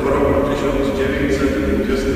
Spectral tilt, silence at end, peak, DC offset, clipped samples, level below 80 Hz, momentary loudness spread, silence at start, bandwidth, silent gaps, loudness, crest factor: -6.5 dB/octave; 0 s; -4 dBFS; under 0.1%; under 0.1%; -28 dBFS; 2 LU; 0 s; 15.5 kHz; none; -18 LUFS; 14 dB